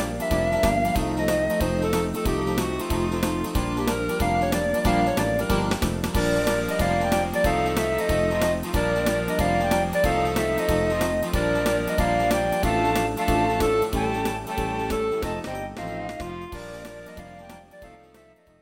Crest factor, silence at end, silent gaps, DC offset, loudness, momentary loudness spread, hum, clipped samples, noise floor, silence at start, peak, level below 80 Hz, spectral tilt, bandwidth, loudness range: 16 dB; 0.65 s; none; under 0.1%; -24 LUFS; 11 LU; none; under 0.1%; -55 dBFS; 0 s; -8 dBFS; -34 dBFS; -5.5 dB/octave; 17 kHz; 6 LU